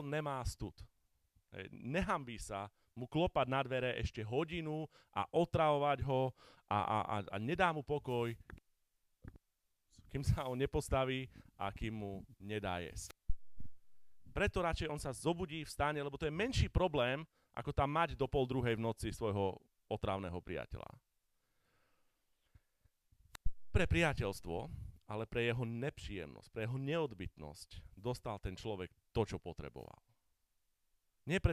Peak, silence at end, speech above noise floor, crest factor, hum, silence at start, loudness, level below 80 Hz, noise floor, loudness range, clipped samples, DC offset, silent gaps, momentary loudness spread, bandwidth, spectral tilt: -18 dBFS; 0 s; 44 dB; 22 dB; none; 0 s; -39 LUFS; -52 dBFS; -82 dBFS; 8 LU; under 0.1%; under 0.1%; none; 15 LU; 15.5 kHz; -6 dB/octave